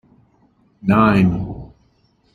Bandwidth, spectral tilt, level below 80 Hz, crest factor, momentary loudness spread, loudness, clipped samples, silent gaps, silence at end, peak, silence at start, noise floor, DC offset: 4.7 kHz; -9 dB/octave; -42 dBFS; 18 dB; 17 LU; -16 LUFS; under 0.1%; none; 0.7 s; -2 dBFS; 0.85 s; -59 dBFS; under 0.1%